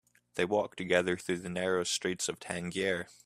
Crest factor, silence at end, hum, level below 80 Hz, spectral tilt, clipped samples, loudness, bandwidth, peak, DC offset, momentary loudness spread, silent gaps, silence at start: 22 dB; 0.15 s; none; -70 dBFS; -3.5 dB/octave; under 0.1%; -32 LUFS; 15 kHz; -10 dBFS; under 0.1%; 6 LU; none; 0.35 s